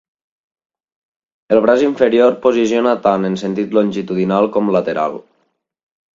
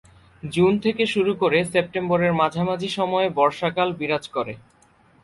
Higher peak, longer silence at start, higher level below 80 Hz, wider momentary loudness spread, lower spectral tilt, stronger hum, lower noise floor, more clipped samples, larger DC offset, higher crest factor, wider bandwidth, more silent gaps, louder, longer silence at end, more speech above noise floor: first, 0 dBFS vs -4 dBFS; first, 1.5 s vs 0.45 s; about the same, -58 dBFS vs -56 dBFS; about the same, 7 LU vs 9 LU; about the same, -6.5 dB/octave vs -6 dB/octave; neither; first, -66 dBFS vs -57 dBFS; neither; neither; about the same, 16 dB vs 18 dB; second, 7.6 kHz vs 11.5 kHz; neither; first, -15 LUFS vs -22 LUFS; first, 0.95 s vs 0.65 s; first, 51 dB vs 35 dB